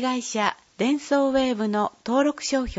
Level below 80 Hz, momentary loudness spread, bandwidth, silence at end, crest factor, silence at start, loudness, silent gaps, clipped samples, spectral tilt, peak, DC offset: -48 dBFS; 4 LU; 8 kHz; 0 s; 18 dB; 0 s; -24 LUFS; none; under 0.1%; -4 dB/octave; -4 dBFS; under 0.1%